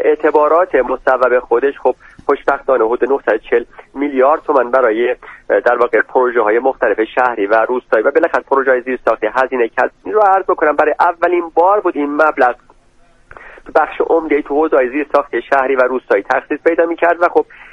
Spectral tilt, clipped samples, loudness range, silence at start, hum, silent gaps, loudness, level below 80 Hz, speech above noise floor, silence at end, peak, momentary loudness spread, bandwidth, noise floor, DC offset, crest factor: -6 dB/octave; under 0.1%; 2 LU; 0 s; none; none; -14 LUFS; -48 dBFS; 35 dB; 0.1 s; 0 dBFS; 5 LU; 6.8 kHz; -48 dBFS; under 0.1%; 14 dB